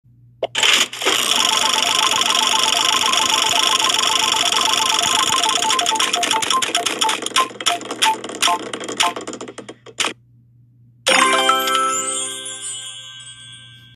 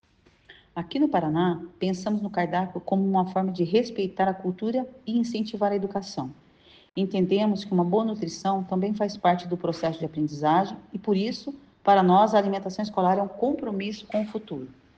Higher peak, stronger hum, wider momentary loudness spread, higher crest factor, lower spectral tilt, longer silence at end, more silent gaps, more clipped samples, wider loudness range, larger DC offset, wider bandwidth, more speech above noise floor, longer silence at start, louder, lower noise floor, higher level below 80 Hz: first, 0 dBFS vs -6 dBFS; neither; first, 14 LU vs 9 LU; about the same, 18 dB vs 18 dB; second, 0.5 dB/octave vs -7 dB/octave; about the same, 0.2 s vs 0.25 s; neither; neither; about the same, 6 LU vs 4 LU; neither; first, 15.5 kHz vs 8 kHz; about the same, 33 dB vs 31 dB; about the same, 0.4 s vs 0.5 s; first, -16 LUFS vs -26 LUFS; second, -51 dBFS vs -56 dBFS; about the same, -64 dBFS vs -64 dBFS